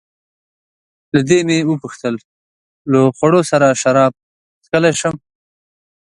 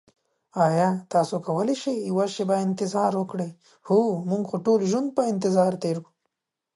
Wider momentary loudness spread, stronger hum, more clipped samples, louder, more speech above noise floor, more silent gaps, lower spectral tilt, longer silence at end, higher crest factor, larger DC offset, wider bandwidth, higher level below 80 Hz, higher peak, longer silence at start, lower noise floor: first, 11 LU vs 7 LU; neither; neither; first, -15 LUFS vs -24 LUFS; first, over 76 dB vs 57 dB; first, 2.25-2.85 s, 4.23-4.61 s vs none; about the same, -5.5 dB/octave vs -6.5 dB/octave; first, 0.95 s vs 0.75 s; about the same, 16 dB vs 16 dB; neither; about the same, 11.5 kHz vs 11.5 kHz; first, -56 dBFS vs -74 dBFS; first, 0 dBFS vs -8 dBFS; first, 1.15 s vs 0.55 s; first, under -90 dBFS vs -80 dBFS